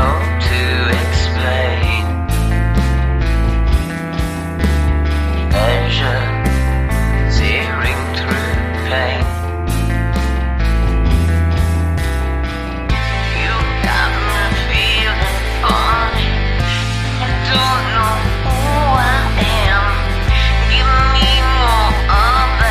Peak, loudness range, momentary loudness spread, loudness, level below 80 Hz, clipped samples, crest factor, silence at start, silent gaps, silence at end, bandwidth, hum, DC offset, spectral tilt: 0 dBFS; 4 LU; 5 LU; -15 LUFS; -18 dBFS; under 0.1%; 14 dB; 0 s; none; 0 s; 15 kHz; none; under 0.1%; -5 dB/octave